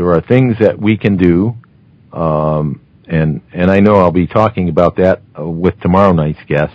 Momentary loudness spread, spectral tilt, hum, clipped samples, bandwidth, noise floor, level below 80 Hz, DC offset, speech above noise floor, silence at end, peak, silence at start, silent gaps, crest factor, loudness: 9 LU; -10 dB/octave; none; 0.6%; 6.8 kHz; -45 dBFS; -32 dBFS; under 0.1%; 34 dB; 0.05 s; 0 dBFS; 0 s; none; 12 dB; -12 LUFS